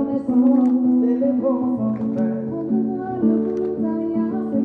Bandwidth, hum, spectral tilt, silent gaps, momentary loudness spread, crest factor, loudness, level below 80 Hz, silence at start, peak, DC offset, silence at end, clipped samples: 2.5 kHz; none; -11 dB/octave; none; 6 LU; 12 dB; -20 LUFS; -60 dBFS; 0 s; -6 dBFS; under 0.1%; 0 s; under 0.1%